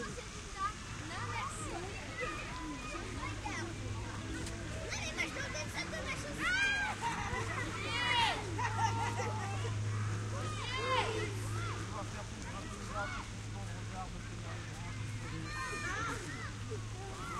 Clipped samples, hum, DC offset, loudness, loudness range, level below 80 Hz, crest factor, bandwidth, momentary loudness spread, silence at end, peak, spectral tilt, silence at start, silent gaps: under 0.1%; none; under 0.1%; -38 LUFS; 7 LU; -50 dBFS; 18 dB; 13 kHz; 10 LU; 0 s; -20 dBFS; -4 dB/octave; 0 s; none